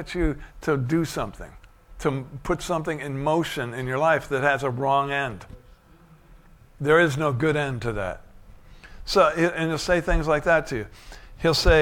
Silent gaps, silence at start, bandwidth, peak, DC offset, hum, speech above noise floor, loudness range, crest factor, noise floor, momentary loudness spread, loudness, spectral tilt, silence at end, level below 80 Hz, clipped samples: none; 0 s; 17.5 kHz; -6 dBFS; under 0.1%; none; 29 dB; 4 LU; 18 dB; -53 dBFS; 12 LU; -24 LUFS; -5.5 dB/octave; 0 s; -36 dBFS; under 0.1%